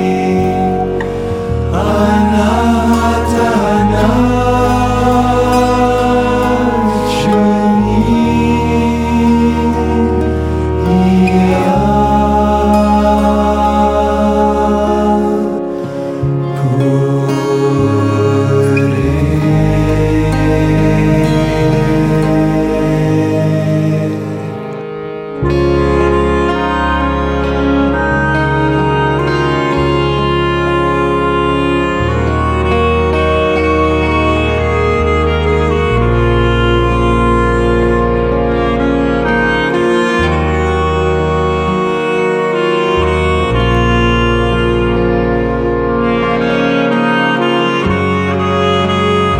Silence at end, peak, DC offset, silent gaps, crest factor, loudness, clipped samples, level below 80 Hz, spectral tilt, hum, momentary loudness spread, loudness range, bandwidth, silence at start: 0 s; 0 dBFS; under 0.1%; none; 12 dB; -12 LUFS; under 0.1%; -22 dBFS; -7 dB/octave; none; 3 LU; 2 LU; 15.5 kHz; 0 s